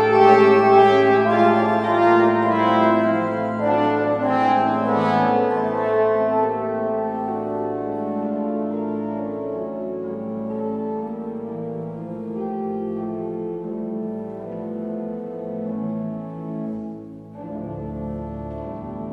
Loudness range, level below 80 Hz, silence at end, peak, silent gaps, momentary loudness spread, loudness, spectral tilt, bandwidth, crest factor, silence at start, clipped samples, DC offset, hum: 12 LU; -52 dBFS; 0 s; -2 dBFS; none; 15 LU; -21 LUFS; -8 dB/octave; 8.2 kHz; 20 dB; 0 s; under 0.1%; under 0.1%; none